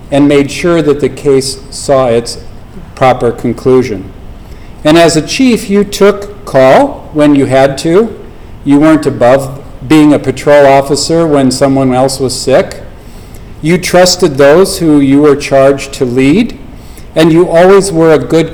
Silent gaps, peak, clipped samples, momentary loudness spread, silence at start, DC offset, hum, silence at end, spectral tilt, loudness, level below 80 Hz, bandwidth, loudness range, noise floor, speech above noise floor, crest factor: none; 0 dBFS; 4%; 10 LU; 0 s; under 0.1%; none; 0 s; -5.5 dB/octave; -8 LUFS; -30 dBFS; 19.5 kHz; 4 LU; -27 dBFS; 21 dB; 8 dB